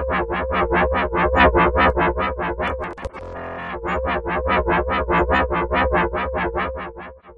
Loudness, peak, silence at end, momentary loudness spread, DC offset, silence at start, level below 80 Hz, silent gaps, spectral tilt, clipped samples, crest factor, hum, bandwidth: -20 LUFS; -2 dBFS; 0.05 s; 15 LU; under 0.1%; 0 s; -30 dBFS; none; -8 dB/octave; under 0.1%; 18 dB; none; 7.2 kHz